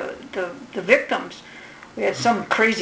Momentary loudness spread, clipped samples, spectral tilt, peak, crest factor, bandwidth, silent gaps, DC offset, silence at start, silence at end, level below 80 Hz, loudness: 20 LU; under 0.1%; -4 dB/octave; -2 dBFS; 22 dB; 8 kHz; none; under 0.1%; 0 s; 0 s; -62 dBFS; -22 LUFS